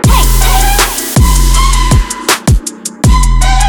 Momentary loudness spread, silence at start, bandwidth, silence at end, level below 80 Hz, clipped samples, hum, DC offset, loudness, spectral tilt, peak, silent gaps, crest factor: 4 LU; 0 s; over 20 kHz; 0 s; -10 dBFS; 0.2%; none; under 0.1%; -10 LUFS; -3.5 dB/octave; 0 dBFS; none; 8 dB